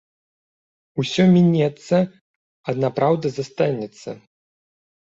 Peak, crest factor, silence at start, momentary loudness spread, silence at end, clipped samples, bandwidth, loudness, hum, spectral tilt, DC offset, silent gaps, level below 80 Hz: -4 dBFS; 16 dB; 0.95 s; 18 LU; 1 s; under 0.1%; 7.8 kHz; -20 LUFS; none; -7.5 dB/octave; under 0.1%; 2.21-2.64 s; -60 dBFS